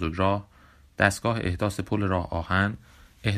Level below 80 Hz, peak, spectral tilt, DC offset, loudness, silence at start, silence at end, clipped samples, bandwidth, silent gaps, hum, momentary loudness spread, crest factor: -48 dBFS; -4 dBFS; -5.5 dB/octave; under 0.1%; -26 LUFS; 0 s; 0 s; under 0.1%; 15.5 kHz; none; none; 8 LU; 24 dB